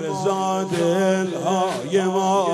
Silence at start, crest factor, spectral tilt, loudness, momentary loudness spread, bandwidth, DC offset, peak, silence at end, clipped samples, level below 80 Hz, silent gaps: 0 s; 12 dB; -5 dB/octave; -21 LUFS; 3 LU; 14 kHz; under 0.1%; -8 dBFS; 0 s; under 0.1%; -64 dBFS; none